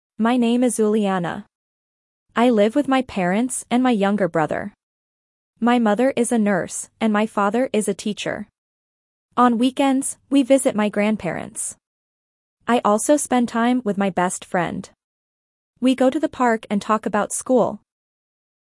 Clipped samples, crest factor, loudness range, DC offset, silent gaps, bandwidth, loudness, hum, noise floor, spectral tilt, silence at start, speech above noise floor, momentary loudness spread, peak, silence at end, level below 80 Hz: under 0.1%; 18 dB; 2 LU; under 0.1%; 1.55-2.26 s, 4.83-5.54 s, 8.58-9.29 s, 11.87-12.57 s, 15.04-15.74 s; 12 kHz; -20 LUFS; none; under -90 dBFS; -5 dB/octave; 0.2 s; over 71 dB; 10 LU; -4 dBFS; 0.85 s; -62 dBFS